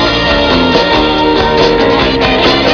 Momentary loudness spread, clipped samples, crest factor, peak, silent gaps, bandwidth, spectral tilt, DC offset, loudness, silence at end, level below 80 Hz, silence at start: 1 LU; under 0.1%; 10 dB; 0 dBFS; none; 5.4 kHz; -5 dB/octave; under 0.1%; -9 LUFS; 0 s; -24 dBFS; 0 s